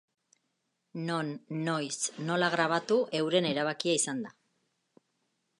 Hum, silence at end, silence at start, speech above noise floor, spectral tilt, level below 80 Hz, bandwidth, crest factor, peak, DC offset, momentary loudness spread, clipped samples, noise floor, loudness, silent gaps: none; 1.3 s; 0.95 s; 50 dB; -3.5 dB/octave; -82 dBFS; 11.5 kHz; 20 dB; -12 dBFS; under 0.1%; 10 LU; under 0.1%; -80 dBFS; -30 LUFS; none